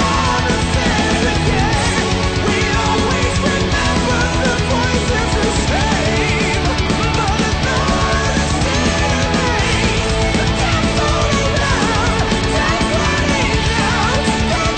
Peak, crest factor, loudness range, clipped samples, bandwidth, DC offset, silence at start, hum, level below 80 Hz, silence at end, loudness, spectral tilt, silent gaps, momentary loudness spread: -4 dBFS; 12 dB; 0 LU; under 0.1%; 9.2 kHz; under 0.1%; 0 s; none; -24 dBFS; 0 s; -15 LUFS; -4.5 dB/octave; none; 1 LU